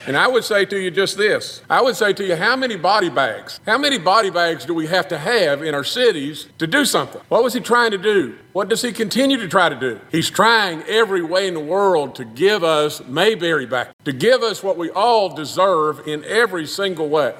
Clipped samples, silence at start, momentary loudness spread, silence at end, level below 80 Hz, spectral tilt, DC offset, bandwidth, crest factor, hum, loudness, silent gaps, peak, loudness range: under 0.1%; 0 s; 7 LU; 0 s; -66 dBFS; -3.5 dB/octave; under 0.1%; 16.5 kHz; 18 dB; none; -18 LUFS; 13.93-13.99 s; 0 dBFS; 1 LU